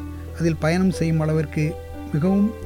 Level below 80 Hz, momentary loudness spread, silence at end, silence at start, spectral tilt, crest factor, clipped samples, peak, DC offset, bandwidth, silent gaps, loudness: -40 dBFS; 8 LU; 0 s; 0 s; -7.5 dB/octave; 12 dB; under 0.1%; -10 dBFS; 0.3%; 16 kHz; none; -22 LUFS